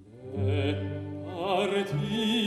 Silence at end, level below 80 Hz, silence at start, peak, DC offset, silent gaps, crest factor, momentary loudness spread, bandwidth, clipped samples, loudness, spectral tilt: 0 s; -60 dBFS; 0 s; -14 dBFS; under 0.1%; none; 16 dB; 10 LU; 13 kHz; under 0.1%; -30 LUFS; -6 dB/octave